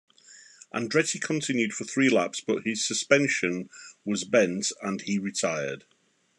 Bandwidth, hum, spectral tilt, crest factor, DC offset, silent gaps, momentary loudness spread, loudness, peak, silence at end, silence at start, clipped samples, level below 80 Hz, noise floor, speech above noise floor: 12 kHz; none; -3.5 dB/octave; 22 dB; under 0.1%; none; 12 LU; -26 LUFS; -6 dBFS; 0.6 s; 0.3 s; under 0.1%; -78 dBFS; -53 dBFS; 26 dB